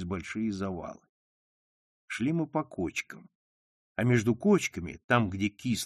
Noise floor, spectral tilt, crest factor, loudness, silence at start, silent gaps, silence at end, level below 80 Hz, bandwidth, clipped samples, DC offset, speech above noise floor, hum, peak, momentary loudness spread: under -90 dBFS; -5.5 dB/octave; 20 dB; -30 LUFS; 0 s; 1.09-2.08 s, 3.35-3.95 s, 5.04-5.09 s; 0 s; -60 dBFS; 13 kHz; under 0.1%; under 0.1%; over 60 dB; none; -10 dBFS; 14 LU